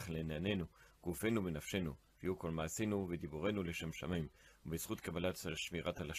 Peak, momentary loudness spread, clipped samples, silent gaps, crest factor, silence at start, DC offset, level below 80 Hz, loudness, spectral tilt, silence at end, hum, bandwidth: -24 dBFS; 8 LU; under 0.1%; none; 16 dB; 0 s; under 0.1%; -62 dBFS; -42 LUFS; -5 dB/octave; 0 s; none; 15 kHz